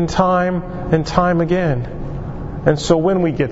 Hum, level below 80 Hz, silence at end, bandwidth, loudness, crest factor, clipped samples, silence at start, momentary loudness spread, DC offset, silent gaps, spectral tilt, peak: none; -32 dBFS; 0 s; 8 kHz; -17 LUFS; 16 dB; under 0.1%; 0 s; 12 LU; under 0.1%; none; -6.5 dB/octave; 0 dBFS